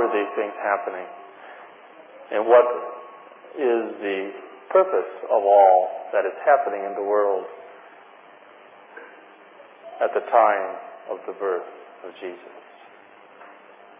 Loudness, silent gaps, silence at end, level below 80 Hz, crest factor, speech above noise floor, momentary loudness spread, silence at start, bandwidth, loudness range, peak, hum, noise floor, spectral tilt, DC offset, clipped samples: -22 LUFS; none; 0.5 s; under -90 dBFS; 22 dB; 28 dB; 26 LU; 0 s; 3.6 kHz; 9 LU; -2 dBFS; none; -49 dBFS; -7.5 dB/octave; under 0.1%; under 0.1%